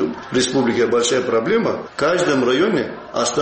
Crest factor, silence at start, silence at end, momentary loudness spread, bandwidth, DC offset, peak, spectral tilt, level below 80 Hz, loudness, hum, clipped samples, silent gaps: 12 dB; 0 s; 0 s; 5 LU; 8.8 kHz; under 0.1%; -6 dBFS; -4 dB/octave; -54 dBFS; -18 LUFS; none; under 0.1%; none